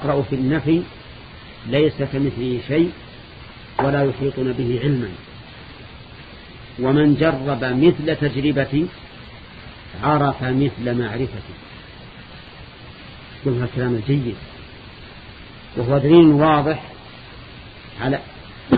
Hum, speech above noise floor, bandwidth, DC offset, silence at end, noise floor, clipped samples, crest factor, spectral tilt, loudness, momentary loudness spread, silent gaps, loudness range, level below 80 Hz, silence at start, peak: none; 21 dB; 5 kHz; under 0.1%; 0 s; -39 dBFS; under 0.1%; 20 dB; -11 dB/octave; -19 LUFS; 23 LU; none; 8 LU; -44 dBFS; 0 s; 0 dBFS